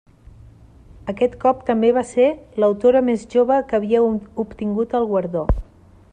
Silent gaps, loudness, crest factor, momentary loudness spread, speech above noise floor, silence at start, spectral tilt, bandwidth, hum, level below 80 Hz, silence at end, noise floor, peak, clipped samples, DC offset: none; -19 LUFS; 16 dB; 9 LU; 27 dB; 1.05 s; -7.5 dB/octave; 9.8 kHz; none; -34 dBFS; 0.5 s; -45 dBFS; -4 dBFS; under 0.1%; under 0.1%